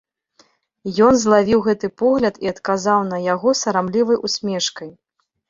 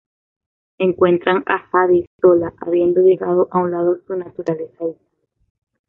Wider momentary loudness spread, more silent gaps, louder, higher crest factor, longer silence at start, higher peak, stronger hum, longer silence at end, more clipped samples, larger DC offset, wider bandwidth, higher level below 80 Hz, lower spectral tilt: about the same, 10 LU vs 10 LU; second, none vs 2.07-2.19 s; about the same, -18 LUFS vs -17 LUFS; about the same, 16 dB vs 16 dB; about the same, 0.85 s vs 0.8 s; about the same, -2 dBFS vs -2 dBFS; neither; second, 0.6 s vs 0.95 s; neither; neither; first, 7.8 kHz vs 4.1 kHz; about the same, -54 dBFS vs -56 dBFS; second, -4.5 dB/octave vs -9 dB/octave